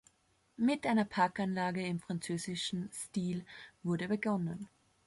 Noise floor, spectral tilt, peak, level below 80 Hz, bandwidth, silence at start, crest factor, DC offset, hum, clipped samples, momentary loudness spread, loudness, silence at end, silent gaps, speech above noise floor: -73 dBFS; -5.5 dB/octave; -18 dBFS; -72 dBFS; 11.5 kHz; 0.6 s; 18 dB; under 0.1%; none; under 0.1%; 10 LU; -35 LUFS; 0.4 s; none; 38 dB